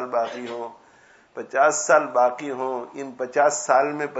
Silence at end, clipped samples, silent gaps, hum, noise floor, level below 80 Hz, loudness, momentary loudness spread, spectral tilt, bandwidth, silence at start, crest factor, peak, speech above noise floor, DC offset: 0 s; under 0.1%; none; none; -54 dBFS; -78 dBFS; -22 LUFS; 17 LU; -2.5 dB/octave; 8 kHz; 0 s; 20 dB; -4 dBFS; 32 dB; under 0.1%